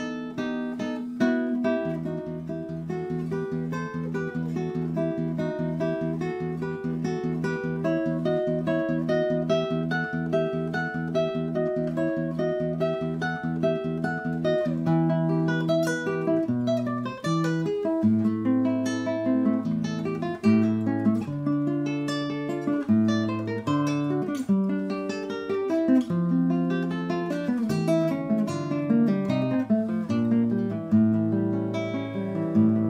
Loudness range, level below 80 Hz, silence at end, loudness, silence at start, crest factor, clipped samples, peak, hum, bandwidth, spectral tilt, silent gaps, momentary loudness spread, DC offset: 4 LU; -60 dBFS; 0 s; -26 LUFS; 0 s; 14 dB; under 0.1%; -12 dBFS; none; 11.5 kHz; -7.5 dB/octave; none; 7 LU; under 0.1%